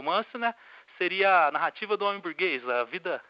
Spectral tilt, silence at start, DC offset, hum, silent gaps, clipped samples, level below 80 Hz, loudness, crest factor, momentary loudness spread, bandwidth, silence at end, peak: -6 dB/octave; 0 s; under 0.1%; none; none; under 0.1%; under -90 dBFS; -27 LUFS; 16 dB; 10 LU; 5.8 kHz; 0.1 s; -12 dBFS